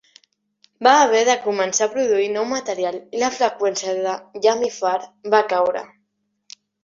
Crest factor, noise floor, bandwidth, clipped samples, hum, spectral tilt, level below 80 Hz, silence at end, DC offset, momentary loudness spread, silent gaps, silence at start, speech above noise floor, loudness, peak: 18 dB; -72 dBFS; 7.8 kHz; under 0.1%; none; -2 dB/octave; -68 dBFS; 0.95 s; under 0.1%; 9 LU; none; 0.8 s; 53 dB; -19 LUFS; -2 dBFS